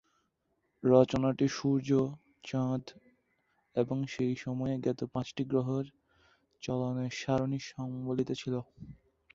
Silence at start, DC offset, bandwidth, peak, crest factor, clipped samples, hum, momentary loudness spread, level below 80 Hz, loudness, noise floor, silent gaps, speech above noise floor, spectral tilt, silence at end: 0.85 s; under 0.1%; 7.6 kHz; -10 dBFS; 24 dB; under 0.1%; none; 11 LU; -64 dBFS; -32 LUFS; -79 dBFS; none; 47 dB; -7 dB/octave; 0.4 s